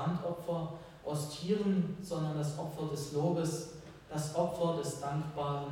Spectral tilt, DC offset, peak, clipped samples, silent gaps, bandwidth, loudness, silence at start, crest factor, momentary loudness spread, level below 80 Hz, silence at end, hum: -6.5 dB/octave; under 0.1%; -18 dBFS; under 0.1%; none; 17 kHz; -36 LUFS; 0 s; 16 dB; 9 LU; -64 dBFS; 0 s; none